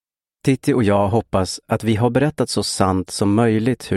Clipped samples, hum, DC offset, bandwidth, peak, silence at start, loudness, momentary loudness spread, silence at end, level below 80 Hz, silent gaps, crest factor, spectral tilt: under 0.1%; none; under 0.1%; 13.5 kHz; 0 dBFS; 0.45 s; -19 LUFS; 5 LU; 0 s; -46 dBFS; none; 18 dB; -6 dB/octave